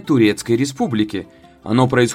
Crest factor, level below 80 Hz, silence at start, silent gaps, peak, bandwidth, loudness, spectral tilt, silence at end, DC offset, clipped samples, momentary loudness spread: 16 dB; -52 dBFS; 0.05 s; none; 0 dBFS; 16 kHz; -18 LUFS; -5.5 dB/octave; 0 s; under 0.1%; under 0.1%; 10 LU